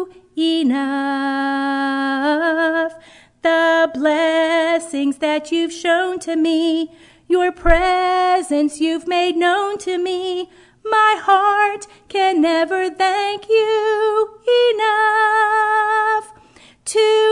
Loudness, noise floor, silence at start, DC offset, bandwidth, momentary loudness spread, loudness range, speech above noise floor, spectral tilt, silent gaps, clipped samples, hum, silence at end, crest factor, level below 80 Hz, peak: -17 LUFS; -48 dBFS; 0 s; under 0.1%; 11 kHz; 7 LU; 3 LU; 31 dB; -3.5 dB/octave; none; under 0.1%; none; 0 s; 18 dB; -36 dBFS; 0 dBFS